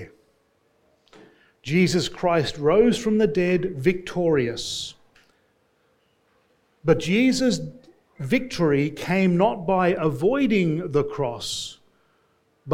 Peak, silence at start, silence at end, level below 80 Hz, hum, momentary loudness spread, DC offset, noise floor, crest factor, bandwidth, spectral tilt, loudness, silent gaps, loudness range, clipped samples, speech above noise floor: -6 dBFS; 0 s; 0 s; -52 dBFS; none; 10 LU; under 0.1%; -65 dBFS; 18 dB; 16 kHz; -5.5 dB/octave; -22 LUFS; none; 4 LU; under 0.1%; 44 dB